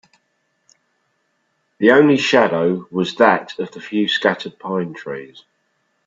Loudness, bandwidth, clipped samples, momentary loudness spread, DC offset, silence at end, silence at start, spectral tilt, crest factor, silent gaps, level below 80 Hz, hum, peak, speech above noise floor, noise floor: -17 LUFS; 7.8 kHz; under 0.1%; 16 LU; under 0.1%; 0.8 s; 1.8 s; -5.5 dB/octave; 18 dB; none; -64 dBFS; none; 0 dBFS; 51 dB; -68 dBFS